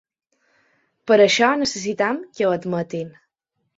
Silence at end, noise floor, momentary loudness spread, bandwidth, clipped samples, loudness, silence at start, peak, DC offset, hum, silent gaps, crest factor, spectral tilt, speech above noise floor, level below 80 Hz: 0.65 s; -75 dBFS; 16 LU; 8 kHz; under 0.1%; -19 LUFS; 1.05 s; -2 dBFS; under 0.1%; none; none; 20 dB; -4 dB/octave; 56 dB; -64 dBFS